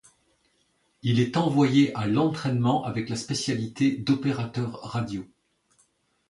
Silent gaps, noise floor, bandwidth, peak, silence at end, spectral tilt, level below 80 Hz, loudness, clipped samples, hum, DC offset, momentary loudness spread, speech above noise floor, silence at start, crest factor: none; -69 dBFS; 11.5 kHz; -8 dBFS; 1.05 s; -6 dB/octave; -60 dBFS; -26 LUFS; under 0.1%; none; under 0.1%; 10 LU; 44 dB; 1.05 s; 18 dB